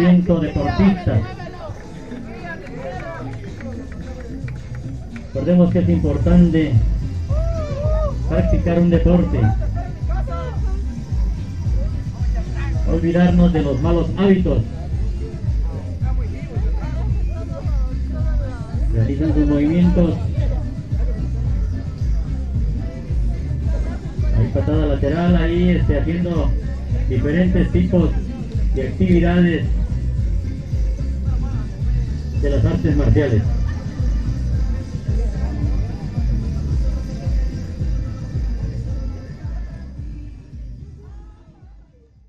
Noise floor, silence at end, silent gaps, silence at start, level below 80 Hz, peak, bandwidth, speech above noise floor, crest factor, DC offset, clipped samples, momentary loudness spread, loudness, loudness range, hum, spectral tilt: -48 dBFS; 0.05 s; none; 0 s; -22 dBFS; 0 dBFS; 7.2 kHz; 32 dB; 18 dB; 0.9%; under 0.1%; 15 LU; -20 LUFS; 8 LU; none; -9 dB/octave